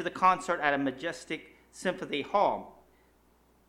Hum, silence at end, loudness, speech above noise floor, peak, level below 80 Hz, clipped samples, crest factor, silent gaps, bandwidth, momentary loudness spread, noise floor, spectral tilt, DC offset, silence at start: none; 0.95 s; -30 LUFS; 35 dB; -10 dBFS; -66 dBFS; under 0.1%; 22 dB; none; 15.5 kHz; 13 LU; -65 dBFS; -4.5 dB/octave; under 0.1%; 0 s